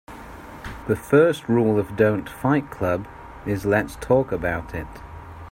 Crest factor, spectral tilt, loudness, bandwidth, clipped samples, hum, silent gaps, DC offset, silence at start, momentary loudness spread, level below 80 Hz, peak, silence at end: 18 dB; -7.5 dB/octave; -22 LUFS; 16 kHz; under 0.1%; none; none; under 0.1%; 0.1 s; 21 LU; -44 dBFS; -4 dBFS; 0 s